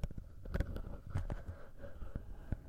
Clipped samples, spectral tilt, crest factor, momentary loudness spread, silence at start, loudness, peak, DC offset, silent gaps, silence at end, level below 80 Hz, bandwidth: under 0.1%; -8 dB/octave; 20 dB; 10 LU; 0 s; -46 LUFS; -22 dBFS; under 0.1%; none; 0 s; -44 dBFS; 15 kHz